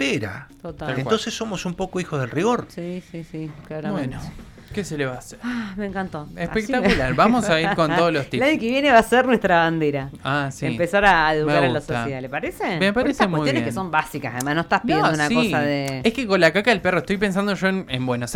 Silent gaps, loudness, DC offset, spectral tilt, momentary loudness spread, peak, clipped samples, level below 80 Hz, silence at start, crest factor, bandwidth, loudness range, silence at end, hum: none; -21 LUFS; under 0.1%; -5.5 dB/octave; 14 LU; -4 dBFS; under 0.1%; -44 dBFS; 0 s; 18 dB; 17.5 kHz; 9 LU; 0 s; none